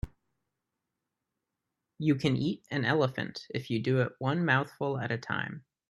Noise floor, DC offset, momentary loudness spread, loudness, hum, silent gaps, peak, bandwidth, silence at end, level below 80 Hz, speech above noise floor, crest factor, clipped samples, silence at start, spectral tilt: -86 dBFS; under 0.1%; 9 LU; -31 LUFS; none; none; -10 dBFS; 12 kHz; 0.3 s; -56 dBFS; 56 dB; 22 dB; under 0.1%; 0.05 s; -7 dB/octave